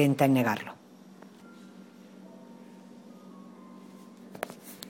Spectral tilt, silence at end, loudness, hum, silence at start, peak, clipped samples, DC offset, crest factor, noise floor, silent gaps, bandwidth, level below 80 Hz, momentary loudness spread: -6.5 dB/octave; 0 s; -28 LUFS; none; 0 s; -10 dBFS; under 0.1%; under 0.1%; 22 dB; -52 dBFS; none; 17 kHz; -76 dBFS; 26 LU